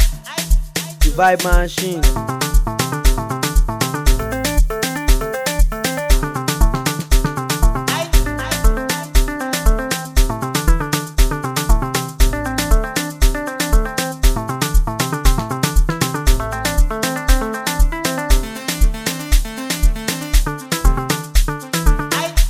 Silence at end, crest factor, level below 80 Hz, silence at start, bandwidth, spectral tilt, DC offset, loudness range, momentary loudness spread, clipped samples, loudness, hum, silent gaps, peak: 0 s; 16 dB; -16 dBFS; 0 s; 16 kHz; -4 dB/octave; 0.1%; 1 LU; 3 LU; under 0.1%; -19 LUFS; none; none; 0 dBFS